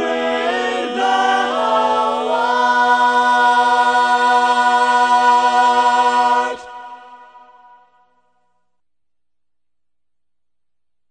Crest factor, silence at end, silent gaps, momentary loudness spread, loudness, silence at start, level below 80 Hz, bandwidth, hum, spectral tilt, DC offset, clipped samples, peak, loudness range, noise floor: 16 dB; 3.95 s; none; 6 LU; -14 LUFS; 0 s; -60 dBFS; 9.6 kHz; none; -1.5 dB/octave; under 0.1%; under 0.1%; -2 dBFS; 7 LU; -86 dBFS